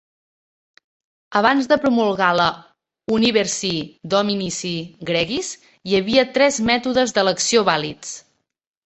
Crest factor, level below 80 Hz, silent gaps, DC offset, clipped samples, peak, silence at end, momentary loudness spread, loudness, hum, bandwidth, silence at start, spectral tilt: 20 dB; -56 dBFS; none; under 0.1%; under 0.1%; 0 dBFS; 0.65 s; 12 LU; -19 LUFS; none; 8.4 kHz; 1.3 s; -3.5 dB/octave